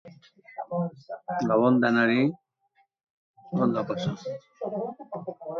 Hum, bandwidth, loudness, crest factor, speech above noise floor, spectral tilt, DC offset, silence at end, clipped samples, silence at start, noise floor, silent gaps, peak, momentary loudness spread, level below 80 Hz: none; 6.8 kHz; -27 LUFS; 18 dB; 43 dB; -7.5 dB/octave; under 0.1%; 0 s; under 0.1%; 0.05 s; -69 dBFS; 3.10-3.34 s; -10 dBFS; 17 LU; -70 dBFS